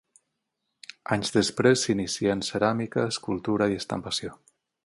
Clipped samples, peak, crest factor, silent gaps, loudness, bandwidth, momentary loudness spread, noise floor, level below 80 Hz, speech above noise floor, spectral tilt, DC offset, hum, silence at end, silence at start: under 0.1%; -8 dBFS; 20 dB; none; -26 LUFS; 11.5 kHz; 12 LU; -81 dBFS; -58 dBFS; 55 dB; -4.5 dB/octave; under 0.1%; none; 0.5 s; 1.1 s